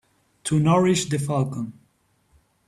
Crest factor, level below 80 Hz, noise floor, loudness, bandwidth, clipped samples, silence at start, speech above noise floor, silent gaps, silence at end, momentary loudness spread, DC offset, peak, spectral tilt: 18 dB; -56 dBFS; -65 dBFS; -22 LUFS; 13.5 kHz; under 0.1%; 0.45 s; 44 dB; none; 0.95 s; 15 LU; under 0.1%; -6 dBFS; -5.5 dB/octave